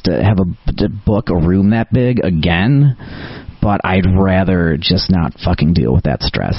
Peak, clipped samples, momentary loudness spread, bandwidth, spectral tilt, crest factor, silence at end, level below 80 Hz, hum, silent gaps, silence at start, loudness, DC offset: 0 dBFS; under 0.1%; 7 LU; 6 kHz; -9.5 dB/octave; 12 dB; 0 s; -26 dBFS; none; none; 0.05 s; -14 LUFS; under 0.1%